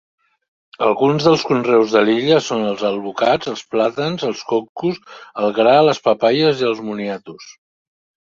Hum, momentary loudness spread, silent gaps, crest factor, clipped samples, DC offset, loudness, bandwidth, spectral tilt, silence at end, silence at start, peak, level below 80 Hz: none; 10 LU; 4.69-4.75 s; 16 dB; under 0.1%; under 0.1%; -17 LUFS; 7.6 kHz; -5.5 dB/octave; 0.8 s; 0.8 s; -2 dBFS; -60 dBFS